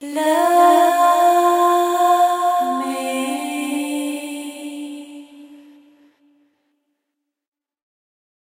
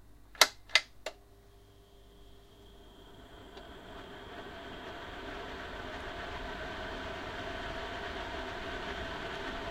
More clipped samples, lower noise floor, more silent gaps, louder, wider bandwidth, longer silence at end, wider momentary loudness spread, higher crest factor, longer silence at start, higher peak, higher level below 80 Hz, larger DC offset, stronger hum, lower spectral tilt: neither; first, -78 dBFS vs -58 dBFS; neither; first, -16 LUFS vs -36 LUFS; about the same, 16 kHz vs 16 kHz; first, 2.95 s vs 0 s; second, 18 LU vs 23 LU; second, 16 dB vs 38 dB; about the same, 0 s vs 0 s; about the same, -2 dBFS vs -2 dBFS; second, -86 dBFS vs -52 dBFS; neither; neither; about the same, -1.5 dB/octave vs -1.5 dB/octave